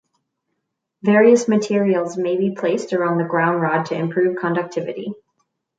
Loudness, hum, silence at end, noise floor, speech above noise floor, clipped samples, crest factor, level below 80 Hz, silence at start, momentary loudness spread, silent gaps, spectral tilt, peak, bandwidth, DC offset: -19 LUFS; none; 0.65 s; -76 dBFS; 58 dB; under 0.1%; 16 dB; -70 dBFS; 1.05 s; 12 LU; none; -6.5 dB/octave; -2 dBFS; 9.2 kHz; under 0.1%